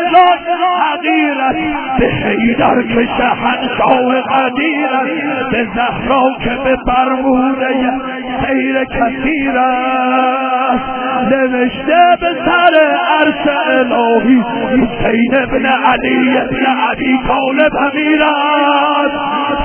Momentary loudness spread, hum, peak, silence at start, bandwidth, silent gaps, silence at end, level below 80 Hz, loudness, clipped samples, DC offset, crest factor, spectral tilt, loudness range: 5 LU; none; 0 dBFS; 0 s; 4 kHz; none; 0 s; -36 dBFS; -12 LUFS; under 0.1%; under 0.1%; 12 dB; -9 dB/octave; 3 LU